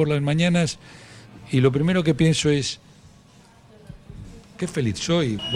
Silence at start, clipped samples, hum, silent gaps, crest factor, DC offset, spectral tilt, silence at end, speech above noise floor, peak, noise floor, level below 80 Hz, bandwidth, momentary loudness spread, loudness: 0 s; under 0.1%; none; none; 18 dB; under 0.1%; -5.5 dB/octave; 0 s; 30 dB; -6 dBFS; -51 dBFS; -48 dBFS; 11.5 kHz; 24 LU; -22 LUFS